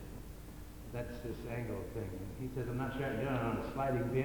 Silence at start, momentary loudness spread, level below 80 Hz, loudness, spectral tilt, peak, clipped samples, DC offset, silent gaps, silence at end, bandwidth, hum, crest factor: 0 s; 15 LU; -52 dBFS; -39 LUFS; -7.5 dB/octave; -20 dBFS; under 0.1%; under 0.1%; none; 0 s; 19.5 kHz; none; 18 dB